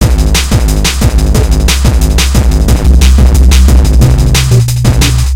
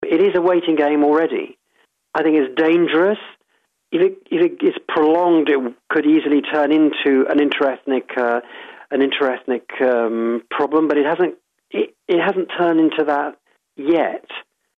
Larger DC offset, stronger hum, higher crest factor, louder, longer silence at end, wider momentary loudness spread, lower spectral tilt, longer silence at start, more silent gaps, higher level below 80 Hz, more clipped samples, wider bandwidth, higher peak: neither; neither; second, 6 dB vs 14 dB; first, -8 LUFS vs -18 LUFS; second, 0 s vs 0.4 s; second, 3 LU vs 10 LU; second, -5 dB/octave vs -7.5 dB/octave; about the same, 0 s vs 0 s; neither; first, -8 dBFS vs -68 dBFS; first, 5% vs under 0.1%; first, 16.5 kHz vs 4.8 kHz; first, 0 dBFS vs -4 dBFS